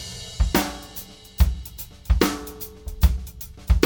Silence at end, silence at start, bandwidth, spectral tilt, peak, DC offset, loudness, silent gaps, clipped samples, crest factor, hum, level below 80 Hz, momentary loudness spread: 0 s; 0 s; 19 kHz; -5 dB/octave; -2 dBFS; under 0.1%; -25 LUFS; none; under 0.1%; 22 dB; none; -26 dBFS; 15 LU